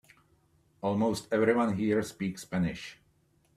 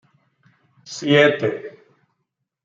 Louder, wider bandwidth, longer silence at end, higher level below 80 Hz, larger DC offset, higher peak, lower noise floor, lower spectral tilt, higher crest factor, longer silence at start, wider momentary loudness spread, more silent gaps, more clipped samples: second, -30 LUFS vs -18 LUFS; first, 14 kHz vs 7.8 kHz; second, 0.6 s vs 0.95 s; first, -62 dBFS vs -68 dBFS; neither; second, -12 dBFS vs -2 dBFS; second, -68 dBFS vs -77 dBFS; first, -6.5 dB/octave vs -5 dB/octave; about the same, 20 dB vs 22 dB; about the same, 0.85 s vs 0.85 s; second, 10 LU vs 21 LU; neither; neither